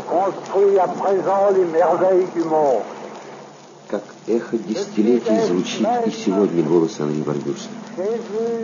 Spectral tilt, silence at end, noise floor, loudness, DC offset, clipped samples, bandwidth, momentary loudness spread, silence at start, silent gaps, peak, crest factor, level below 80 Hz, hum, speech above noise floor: -6 dB/octave; 0 s; -41 dBFS; -19 LUFS; under 0.1%; under 0.1%; 7.4 kHz; 13 LU; 0 s; none; -4 dBFS; 16 dB; -72 dBFS; none; 22 dB